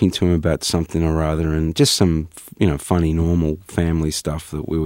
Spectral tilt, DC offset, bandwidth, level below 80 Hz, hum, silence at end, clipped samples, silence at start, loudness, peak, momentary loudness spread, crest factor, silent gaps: -5.5 dB/octave; under 0.1%; 16.5 kHz; -30 dBFS; none; 0 s; under 0.1%; 0 s; -19 LUFS; -2 dBFS; 8 LU; 18 dB; none